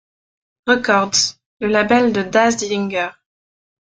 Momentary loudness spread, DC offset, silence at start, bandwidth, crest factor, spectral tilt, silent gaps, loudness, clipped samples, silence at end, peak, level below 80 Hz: 9 LU; under 0.1%; 0.65 s; 9.6 kHz; 18 dB; -3 dB/octave; 1.46-1.57 s; -17 LUFS; under 0.1%; 0.75 s; -2 dBFS; -56 dBFS